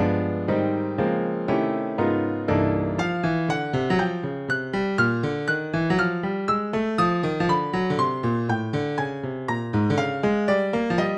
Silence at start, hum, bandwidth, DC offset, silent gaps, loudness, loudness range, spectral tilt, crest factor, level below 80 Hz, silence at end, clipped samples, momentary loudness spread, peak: 0 s; none; 10 kHz; under 0.1%; none; -24 LUFS; 1 LU; -7.5 dB/octave; 14 dB; -52 dBFS; 0 s; under 0.1%; 4 LU; -8 dBFS